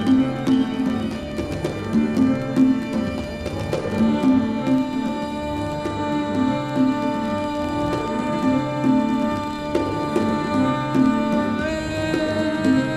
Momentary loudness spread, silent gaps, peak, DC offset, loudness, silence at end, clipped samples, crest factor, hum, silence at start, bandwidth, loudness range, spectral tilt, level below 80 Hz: 7 LU; none; -6 dBFS; under 0.1%; -22 LUFS; 0 s; under 0.1%; 16 dB; none; 0 s; 12.5 kHz; 2 LU; -6.5 dB/octave; -42 dBFS